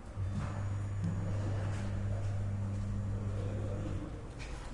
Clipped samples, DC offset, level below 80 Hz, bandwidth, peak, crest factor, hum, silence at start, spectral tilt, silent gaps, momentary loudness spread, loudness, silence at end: under 0.1%; under 0.1%; -44 dBFS; 10.5 kHz; -24 dBFS; 12 dB; none; 0 s; -7.5 dB/octave; none; 5 LU; -38 LUFS; 0 s